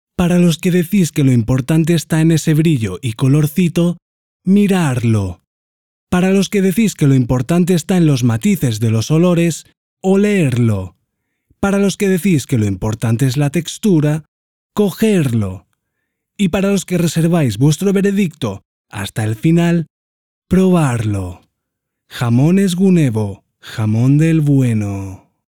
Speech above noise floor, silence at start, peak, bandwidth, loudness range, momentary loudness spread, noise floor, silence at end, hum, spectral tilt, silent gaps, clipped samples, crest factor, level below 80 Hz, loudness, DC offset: 62 dB; 0.2 s; -2 dBFS; 18 kHz; 3 LU; 11 LU; -76 dBFS; 0.45 s; none; -6.5 dB/octave; 4.02-4.40 s, 5.47-6.07 s, 9.77-9.97 s, 14.28-14.70 s, 18.65-18.84 s, 19.90-20.42 s; under 0.1%; 12 dB; -44 dBFS; -15 LUFS; 0.4%